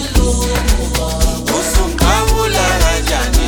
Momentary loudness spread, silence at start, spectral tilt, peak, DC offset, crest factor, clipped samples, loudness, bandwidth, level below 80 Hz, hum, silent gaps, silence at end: 4 LU; 0 s; -4 dB/octave; 0 dBFS; under 0.1%; 14 dB; under 0.1%; -14 LUFS; over 20 kHz; -16 dBFS; none; none; 0 s